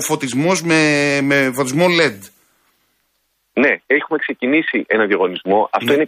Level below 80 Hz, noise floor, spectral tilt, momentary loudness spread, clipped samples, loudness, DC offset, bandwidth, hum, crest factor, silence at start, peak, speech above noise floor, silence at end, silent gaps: -62 dBFS; -66 dBFS; -4.5 dB/octave; 5 LU; under 0.1%; -16 LUFS; under 0.1%; 15.5 kHz; none; 16 dB; 0 s; -2 dBFS; 51 dB; 0 s; none